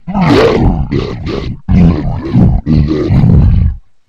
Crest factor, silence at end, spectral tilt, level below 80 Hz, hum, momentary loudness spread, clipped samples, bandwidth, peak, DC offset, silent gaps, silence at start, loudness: 10 dB; 0.3 s; -8.5 dB/octave; -16 dBFS; none; 10 LU; 1%; 7.8 kHz; 0 dBFS; 1%; none; 0.05 s; -10 LUFS